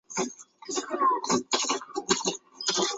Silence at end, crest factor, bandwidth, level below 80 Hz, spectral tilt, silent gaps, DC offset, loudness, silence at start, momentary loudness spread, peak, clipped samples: 0 s; 22 dB; 8.2 kHz; -70 dBFS; -1.5 dB/octave; none; under 0.1%; -28 LUFS; 0.1 s; 8 LU; -8 dBFS; under 0.1%